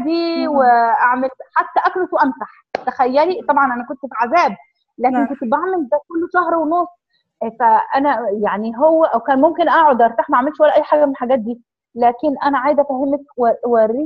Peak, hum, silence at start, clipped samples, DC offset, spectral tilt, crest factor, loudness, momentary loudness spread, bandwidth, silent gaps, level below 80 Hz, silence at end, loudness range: 0 dBFS; none; 0 s; under 0.1%; under 0.1%; -6.5 dB/octave; 16 dB; -16 LUFS; 8 LU; 6.6 kHz; none; -60 dBFS; 0 s; 4 LU